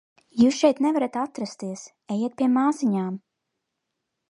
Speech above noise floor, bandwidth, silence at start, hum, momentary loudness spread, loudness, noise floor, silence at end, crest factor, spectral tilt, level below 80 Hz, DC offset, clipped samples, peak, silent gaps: 58 dB; 11 kHz; 0.35 s; none; 15 LU; -23 LUFS; -81 dBFS; 1.15 s; 20 dB; -5.5 dB/octave; -66 dBFS; under 0.1%; under 0.1%; -6 dBFS; none